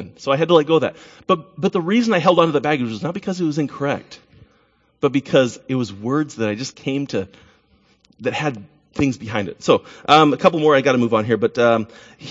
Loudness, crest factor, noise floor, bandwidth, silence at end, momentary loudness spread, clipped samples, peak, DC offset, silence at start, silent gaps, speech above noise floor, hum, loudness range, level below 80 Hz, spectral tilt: -19 LUFS; 20 dB; -60 dBFS; 8 kHz; 0 s; 11 LU; under 0.1%; 0 dBFS; under 0.1%; 0 s; none; 41 dB; none; 8 LU; -56 dBFS; -6 dB/octave